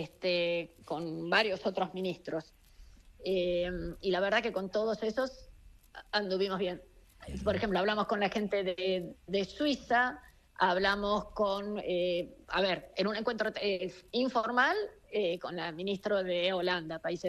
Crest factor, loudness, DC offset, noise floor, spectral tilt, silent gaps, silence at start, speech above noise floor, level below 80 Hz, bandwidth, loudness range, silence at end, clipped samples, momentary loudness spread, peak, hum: 20 dB; -32 LUFS; under 0.1%; -56 dBFS; -5.5 dB/octave; none; 0 s; 23 dB; -56 dBFS; 13 kHz; 3 LU; 0 s; under 0.1%; 9 LU; -12 dBFS; none